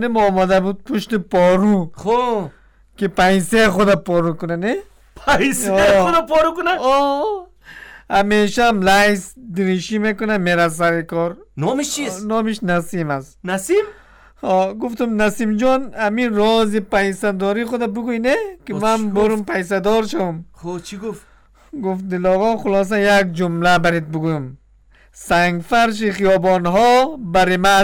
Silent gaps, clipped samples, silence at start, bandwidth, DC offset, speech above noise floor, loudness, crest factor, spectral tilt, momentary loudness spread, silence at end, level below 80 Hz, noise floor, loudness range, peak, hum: none; under 0.1%; 0 s; 19 kHz; under 0.1%; 34 dB; -17 LUFS; 12 dB; -5 dB/octave; 11 LU; 0 s; -42 dBFS; -50 dBFS; 4 LU; -6 dBFS; none